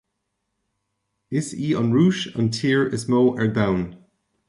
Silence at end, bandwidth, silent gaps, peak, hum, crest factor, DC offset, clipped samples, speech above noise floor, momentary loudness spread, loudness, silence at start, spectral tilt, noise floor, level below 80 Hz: 0.55 s; 11.5 kHz; none; -6 dBFS; none; 16 dB; under 0.1%; under 0.1%; 57 dB; 9 LU; -21 LUFS; 1.3 s; -6.5 dB/octave; -77 dBFS; -52 dBFS